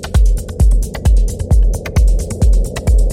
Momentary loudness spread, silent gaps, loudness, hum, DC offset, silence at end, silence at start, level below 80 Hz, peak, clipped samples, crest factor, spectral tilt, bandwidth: 2 LU; none; -16 LUFS; none; under 0.1%; 0 s; 0 s; -12 dBFS; -2 dBFS; under 0.1%; 10 dB; -6.5 dB/octave; 13 kHz